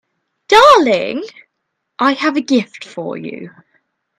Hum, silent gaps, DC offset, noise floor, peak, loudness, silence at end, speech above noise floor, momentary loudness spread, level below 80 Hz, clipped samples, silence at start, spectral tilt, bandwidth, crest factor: none; none; under 0.1%; -73 dBFS; 0 dBFS; -12 LUFS; 0.7 s; 56 dB; 21 LU; -52 dBFS; 0.2%; 0.5 s; -4 dB/octave; 16 kHz; 16 dB